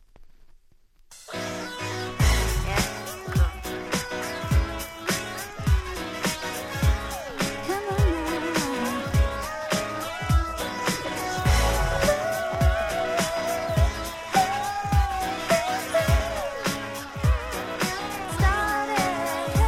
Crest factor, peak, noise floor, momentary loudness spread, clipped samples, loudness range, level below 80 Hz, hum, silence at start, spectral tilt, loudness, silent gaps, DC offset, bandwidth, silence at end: 18 dB; -8 dBFS; -56 dBFS; 8 LU; under 0.1%; 3 LU; -30 dBFS; none; 0.15 s; -4.5 dB/octave; -26 LUFS; none; under 0.1%; 16.5 kHz; 0 s